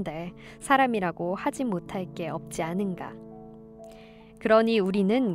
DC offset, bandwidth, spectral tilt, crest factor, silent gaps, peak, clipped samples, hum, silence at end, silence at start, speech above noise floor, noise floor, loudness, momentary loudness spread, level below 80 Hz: under 0.1%; 15 kHz; -6 dB/octave; 20 dB; none; -8 dBFS; under 0.1%; none; 0 s; 0 s; 22 dB; -49 dBFS; -26 LUFS; 24 LU; -58 dBFS